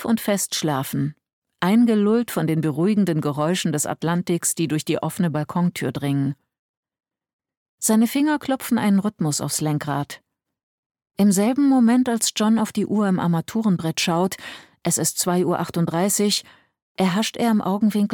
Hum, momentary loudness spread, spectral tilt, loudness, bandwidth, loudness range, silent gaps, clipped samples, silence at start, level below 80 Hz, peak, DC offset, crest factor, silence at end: none; 8 LU; -5 dB/octave; -21 LUFS; 19 kHz; 4 LU; 1.33-1.42 s, 6.59-6.83 s, 7.33-7.39 s, 7.57-7.78 s, 10.63-10.90 s, 16.82-16.95 s; under 0.1%; 0 s; -62 dBFS; -6 dBFS; under 0.1%; 16 dB; 0 s